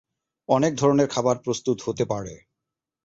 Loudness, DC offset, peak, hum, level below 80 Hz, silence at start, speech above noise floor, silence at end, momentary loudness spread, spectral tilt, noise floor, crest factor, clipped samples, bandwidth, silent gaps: -23 LUFS; under 0.1%; -6 dBFS; none; -58 dBFS; 0.5 s; 63 dB; 0.7 s; 11 LU; -5.5 dB/octave; -86 dBFS; 18 dB; under 0.1%; 8 kHz; none